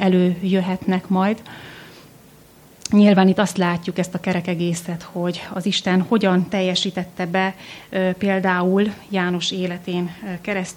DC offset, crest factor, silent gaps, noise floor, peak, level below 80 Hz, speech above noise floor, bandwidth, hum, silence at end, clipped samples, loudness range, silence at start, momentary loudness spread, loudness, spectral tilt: under 0.1%; 16 dB; none; -48 dBFS; -4 dBFS; -58 dBFS; 28 dB; 15 kHz; none; 0.05 s; under 0.1%; 2 LU; 0 s; 11 LU; -20 LUFS; -6 dB/octave